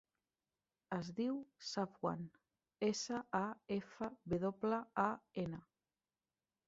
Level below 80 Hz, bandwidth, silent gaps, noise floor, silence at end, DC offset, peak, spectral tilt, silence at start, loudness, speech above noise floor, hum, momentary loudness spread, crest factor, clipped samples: -74 dBFS; 7.6 kHz; none; under -90 dBFS; 1.05 s; under 0.1%; -20 dBFS; -5 dB/octave; 0.9 s; -42 LUFS; over 49 dB; none; 8 LU; 22 dB; under 0.1%